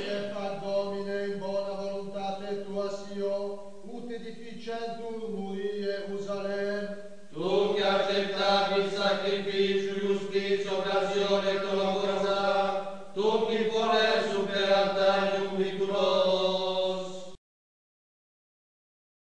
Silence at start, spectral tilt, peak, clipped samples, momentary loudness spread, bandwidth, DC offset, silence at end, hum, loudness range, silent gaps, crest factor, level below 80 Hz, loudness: 0 s; -4.5 dB/octave; -12 dBFS; under 0.1%; 12 LU; 10 kHz; 0.7%; 1.8 s; none; 9 LU; none; 18 dB; -70 dBFS; -29 LUFS